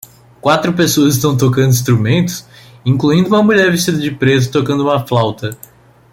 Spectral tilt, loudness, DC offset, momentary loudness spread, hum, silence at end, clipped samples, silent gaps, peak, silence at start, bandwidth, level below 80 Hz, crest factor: -5.5 dB/octave; -13 LUFS; under 0.1%; 8 LU; none; 0.6 s; under 0.1%; none; 0 dBFS; 0.45 s; 16.5 kHz; -48 dBFS; 14 dB